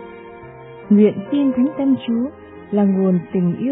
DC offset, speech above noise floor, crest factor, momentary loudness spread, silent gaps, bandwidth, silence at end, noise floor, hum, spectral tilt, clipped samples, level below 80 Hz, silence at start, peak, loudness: under 0.1%; 21 dB; 14 dB; 23 LU; none; 3.9 kHz; 0 s; -37 dBFS; none; -12.5 dB/octave; under 0.1%; -58 dBFS; 0 s; -4 dBFS; -18 LUFS